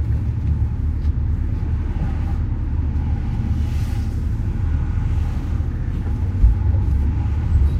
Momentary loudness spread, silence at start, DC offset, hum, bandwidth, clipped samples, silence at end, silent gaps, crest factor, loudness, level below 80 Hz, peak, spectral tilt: 5 LU; 0 s; under 0.1%; none; 6.2 kHz; under 0.1%; 0 s; none; 16 dB; -22 LUFS; -20 dBFS; -2 dBFS; -9 dB/octave